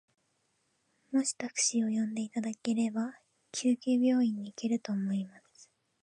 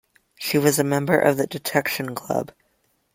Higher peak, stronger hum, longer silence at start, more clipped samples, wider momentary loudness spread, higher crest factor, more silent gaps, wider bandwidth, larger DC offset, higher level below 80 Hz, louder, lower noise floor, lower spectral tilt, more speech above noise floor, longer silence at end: second, -16 dBFS vs -2 dBFS; neither; first, 1.1 s vs 0.4 s; neither; about the same, 9 LU vs 9 LU; about the same, 16 dB vs 20 dB; neither; second, 10.5 kHz vs 16.5 kHz; neither; second, -84 dBFS vs -62 dBFS; second, -32 LUFS vs -22 LUFS; first, -76 dBFS vs -67 dBFS; about the same, -4 dB/octave vs -4.5 dB/octave; about the same, 45 dB vs 46 dB; about the same, 0.65 s vs 0.7 s